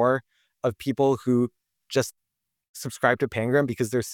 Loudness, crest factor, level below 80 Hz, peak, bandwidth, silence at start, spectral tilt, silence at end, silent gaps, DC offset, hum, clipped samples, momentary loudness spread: -25 LUFS; 20 dB; -64 dBFS; -6 dBFS; 18.5 kHz; 0 s; -5.5 dB/octave; 0 s; 2.69-2.74 s; under 0.1%; none; under 0.1%; 10 LU